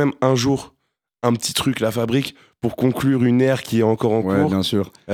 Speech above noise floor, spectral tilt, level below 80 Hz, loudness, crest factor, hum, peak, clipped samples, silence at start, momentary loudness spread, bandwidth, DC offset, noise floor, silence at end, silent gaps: 21 dB; -5.5 dB/octave; -52 dBFS; -19 LUFS; 18 dB; none; -2 dBFS; under 0.1%; 0 s; 7 LU; 18.5 kHz; under 0.1%; -40 dBFS; 0 s; none